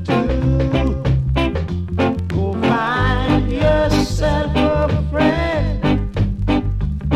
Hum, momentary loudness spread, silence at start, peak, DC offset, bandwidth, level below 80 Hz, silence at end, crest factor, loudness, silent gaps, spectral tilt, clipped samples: none; 4 LU; 0 s; -2 dBFS; under 0.1%; 13 kHz; -24 dBFS; 0 s; 16 dB; -18 LUFS; none; -7 dB/octave; under 0.1%